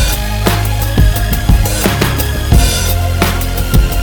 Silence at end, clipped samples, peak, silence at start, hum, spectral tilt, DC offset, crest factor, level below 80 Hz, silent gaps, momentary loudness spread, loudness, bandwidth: 0 s; 0.1%; 0 dBFS; 0 s; none; -4.5 dB/octave; under 0.1%; 12 dB; -14 dBFS; none; 3 LU; -13 LUFS; 19.5 kHz